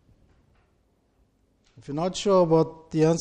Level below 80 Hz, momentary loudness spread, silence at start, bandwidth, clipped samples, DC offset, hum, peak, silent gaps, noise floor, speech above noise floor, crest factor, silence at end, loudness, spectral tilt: -58 dBFS; 10 LU; 1.9 s; 9.4 kHz; under 0.1%; under 0.1%; none; -8 dBFS; none; -67 dBFS; 44 dB; 18 dB; 0 s; -24 LUFS; -6.5 dB/octave